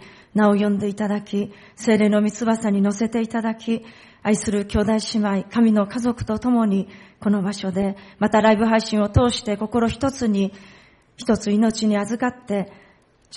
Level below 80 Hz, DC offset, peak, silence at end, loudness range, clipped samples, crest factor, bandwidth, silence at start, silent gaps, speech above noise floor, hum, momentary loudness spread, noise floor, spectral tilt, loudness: -44 dBFS; under 0.1%; -6 dBFS; 0 s; 2 LU; under 0.1%; 14 dB; 11.5 kHz; 0 s; none; 31 dB; none; 9 LU; -52 dBFS; -6 dB/octave; -21 LUFS